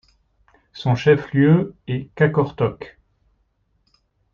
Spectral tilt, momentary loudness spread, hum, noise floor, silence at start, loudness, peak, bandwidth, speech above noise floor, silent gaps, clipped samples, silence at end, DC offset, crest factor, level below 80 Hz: -8.5 dB/octave; 12 LU; none; -66 dBFS; 0.75 s; -19 LUFS; -4 dBFS; 7 kHz; 48 dB; none; under 0.1%; 1.45 s; under 0.1%; 18 dB; -54 dBFS